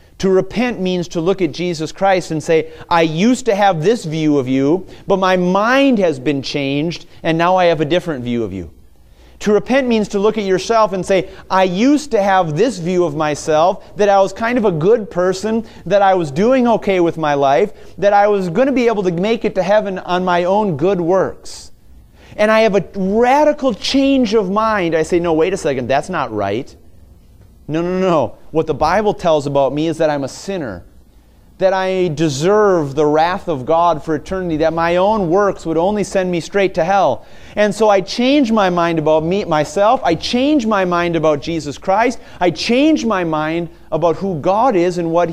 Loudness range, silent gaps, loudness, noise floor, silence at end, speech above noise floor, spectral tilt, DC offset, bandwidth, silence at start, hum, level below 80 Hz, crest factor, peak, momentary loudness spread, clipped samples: 3 LU; none; -15 LUFS; -45 dBFS; 0 s; 31 dB; -5.5 dB/octave; under 0.1%; 14.5 kHz; 0.2 s; none; -42 dBFS; 14 dB; 0 dBFS; 8 LU; under 0.1%